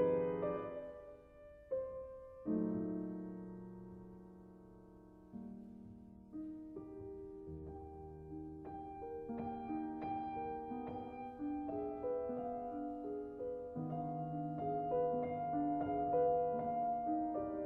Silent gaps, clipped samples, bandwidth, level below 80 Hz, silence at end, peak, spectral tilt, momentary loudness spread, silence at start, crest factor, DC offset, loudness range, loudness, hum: none; under 0.1%; 4.2 kHz; -66 dBFS; 0 s; -24 dBFS; -9 dB/octave; 18 LU; 0 s; 18 dB; under 0.1%; 14 LU; -42 LUFS; none